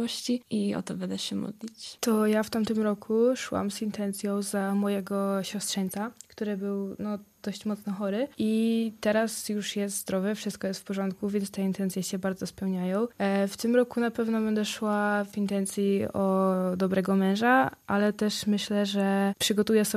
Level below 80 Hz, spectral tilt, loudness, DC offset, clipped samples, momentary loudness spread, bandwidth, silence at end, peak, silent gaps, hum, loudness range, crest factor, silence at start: -66 dBFS; -5 dB/octave; -28 LUFS; under 0.1%; under 0.1%; 8 LU; 15 kHz; 0 s; -10 dBFS; none; none; 5 LU; 16 dB; 0 s